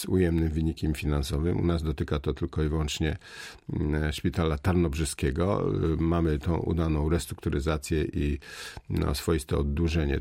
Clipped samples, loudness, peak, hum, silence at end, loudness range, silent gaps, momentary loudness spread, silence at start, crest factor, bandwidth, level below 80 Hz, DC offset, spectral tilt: under 0.1%; -28 LUFS; -12 dBFS; none; 0 s; 2 LU; none; 6 LU; 0 s; 14 dB; 16 kHz; -36 dBFS; under 0.1%; -6.5 dB/octave